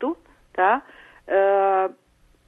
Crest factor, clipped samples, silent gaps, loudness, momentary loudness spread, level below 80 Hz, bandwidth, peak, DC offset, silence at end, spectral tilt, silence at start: 18 dB; under 0.1%; none; -21 LUFS; 13 LU; -62 dBFS; 3.9 kHz; -6 dBFS; under 0.1%; 0.55 s; -6.5 dB/octave; 0 s